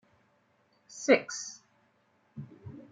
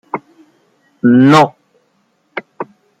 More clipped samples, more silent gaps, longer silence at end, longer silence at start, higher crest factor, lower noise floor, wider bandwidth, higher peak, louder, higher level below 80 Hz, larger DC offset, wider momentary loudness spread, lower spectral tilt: neither; neither; second, 0.1 s vs 0.35 s; first, 0.95 s vs 0.15 s; first, 26 dB vs 14 dB; first, -70 dBFS vs -60 dBFS; about the same, 9.4 kHz vs 10 kHz; second, -8 dBFS vs 0 dBFS; second, -29 LUFS vs -10 LUFS; second, -80 dBFS vs -56 dBFS; neither; first, 25 LU vs 22 LU; second, -3.5 dB/octave vs -6.5 dB/octave